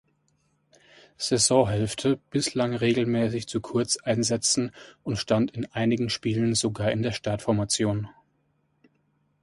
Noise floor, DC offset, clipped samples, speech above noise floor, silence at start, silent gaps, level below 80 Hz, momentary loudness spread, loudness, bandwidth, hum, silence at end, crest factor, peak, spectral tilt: -70 dBFS; under 0.1%; under 0.1%; 45 dB; 1.2 s; none; -54 dBFS; 8 LU; -25 LUFS; 11.5 kHz; none; 1.3 s; 20 dB; -8 dBFS; -4.5 dB/octave